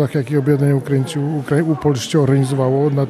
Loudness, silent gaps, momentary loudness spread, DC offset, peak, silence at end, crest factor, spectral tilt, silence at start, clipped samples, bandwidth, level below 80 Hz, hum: -17 LUFS; none; 4 LU; under 0.1%; -2 dBFS; 0 s; 14 dB; -7 dB/octave; 0 s; under 0.1%; 13.5 kHz; -54 dBFS; none